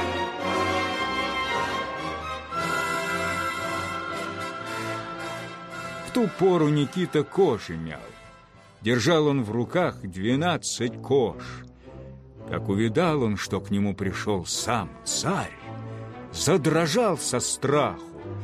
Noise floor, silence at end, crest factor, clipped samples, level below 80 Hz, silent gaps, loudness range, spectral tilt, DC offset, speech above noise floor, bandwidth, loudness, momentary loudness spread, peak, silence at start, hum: -51 dBFS; 0 s; 18 dB; under 0.1%; -50 dBFS; none; 4 LU; -4.5 dB/octave; under 0.1%; 27 dB; 15.5 kHz; -26 LUFS; 15 LU; -8 dBFS; 0 s; none